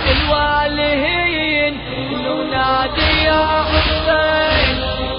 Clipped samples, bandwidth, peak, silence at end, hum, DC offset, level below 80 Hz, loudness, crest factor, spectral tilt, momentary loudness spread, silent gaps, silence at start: under 0.1%; 5.4 kHz; -2 dBFS; 0 s; none; under 0.1%; -26 dBFS; -15 LUFS; 14 dB; -10 dB/octave; 6 LU; none; 0 s